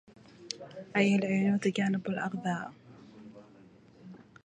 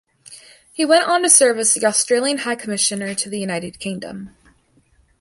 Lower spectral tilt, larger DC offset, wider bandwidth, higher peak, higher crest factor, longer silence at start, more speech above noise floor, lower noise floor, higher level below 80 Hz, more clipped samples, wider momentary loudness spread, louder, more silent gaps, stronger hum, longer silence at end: first, -6 dB/octave vs -2 dB/octave; neither; second, 9.4 kHz vs 12 kHz; second, -10 dBFS vs 0 dBFS; about the same, 22 dB vs 20 dB; about the same, 0.4 s vs 0.3 s; second, 28 dB vs 39 dB; about the same, -57 dBFS vs -58 dBFS; second, -74 dBFS vs -60 dBFS; neither; first, 25 LU vs 17 LU; second, -31 LUFS vs -17 LUFS; neither; neither; second, 0.3 s vs 0.9 s